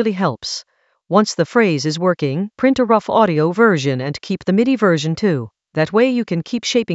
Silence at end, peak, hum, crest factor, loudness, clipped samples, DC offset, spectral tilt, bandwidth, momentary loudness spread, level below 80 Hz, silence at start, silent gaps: 0 s; 0 dBFS; none; 16 dB; -17 LUFS; under 0.1%; under 0.1%; -5.5 dB/octave; 8.2 kHz; 9 LU; -58 dBFS; 0 s; none